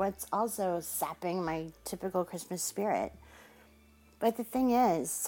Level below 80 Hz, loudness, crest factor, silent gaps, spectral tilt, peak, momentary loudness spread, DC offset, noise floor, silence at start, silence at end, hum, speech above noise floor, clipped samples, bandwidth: -62 dBFS; -33 LUFS; 18 dB; none; -4.5 dB/octave; -16 dBFS; 10 LU; under 0.1%; -61 dBFS; 0 s; 0 s; none; 29 dB; under 0.1%; 17 kHz